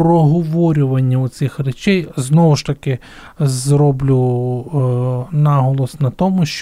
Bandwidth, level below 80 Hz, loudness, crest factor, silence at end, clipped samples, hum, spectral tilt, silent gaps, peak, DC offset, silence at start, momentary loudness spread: 12.5 kHz; -42 dBFS; -16 LUFS; 12 dB; 0 s; under 0.1%; none; -7 dB/octave; none; -2 dBFS; under 0.1%; 0 s; 7 LU